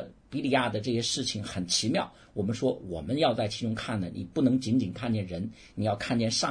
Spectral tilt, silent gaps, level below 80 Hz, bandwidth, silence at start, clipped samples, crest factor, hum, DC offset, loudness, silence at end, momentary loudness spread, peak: -4.5 dB/octave; none; -56 dBFS; 10.5 kHz; 0 s; under 0.1%; 18 dB; none; under 0.1%; -29 LUFS; 0 s; 8 LU; -12 dBFS